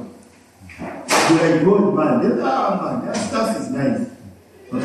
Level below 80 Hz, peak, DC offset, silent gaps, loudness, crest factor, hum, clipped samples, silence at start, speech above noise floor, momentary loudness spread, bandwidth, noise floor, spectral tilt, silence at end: -60 dBFS; -4 dBFS; under 0.1%; none; -18 LUFS; 16 dB; none; under 0.1%; 0 s; 29 dB; 17 LU; 13.5 kHz; -46 dBFS; -5 dB/octave; 0 s